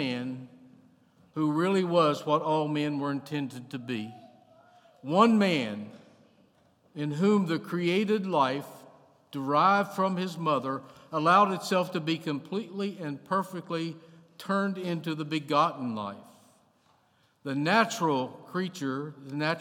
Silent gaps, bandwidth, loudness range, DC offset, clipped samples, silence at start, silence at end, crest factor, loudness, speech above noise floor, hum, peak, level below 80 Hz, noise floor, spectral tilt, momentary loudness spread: none; 16.5 kHz; 5 LU; under 0.1%; under 0.1%; 0 s; 0 s; 22 dB; -28 LUFS; 39 dB; none; -8 dBFS; -84 dBFS; -67 dBFS; -6 dB/octave; 15 LU